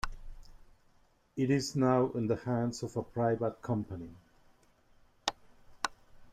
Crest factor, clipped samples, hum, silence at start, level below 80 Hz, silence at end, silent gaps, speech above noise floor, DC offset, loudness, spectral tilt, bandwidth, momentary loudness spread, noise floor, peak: 24 dB; under 0.1%; none; 0.05 s; -54 dBFS; 0 s; none; 35 dB; under 0.1%; -33 LUFS; -6 dB/octave; 14.5 kHz; 15 LU; -67 dBFS; -10 dBFS